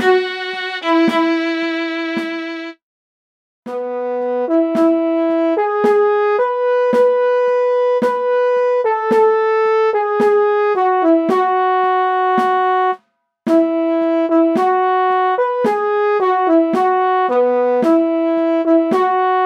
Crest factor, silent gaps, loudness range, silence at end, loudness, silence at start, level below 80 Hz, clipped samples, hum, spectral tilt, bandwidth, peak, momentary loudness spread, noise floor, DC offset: 12 dB; 2.83-3.63 s; 5 LU; 0 s; -15 LUFS; 0 s; -76 dBFS; under 0.1%; none; -5.5 dB/octave; 9.4 kHz; -2 dBFS; 7 LU; -55 dBFS; under 0.1%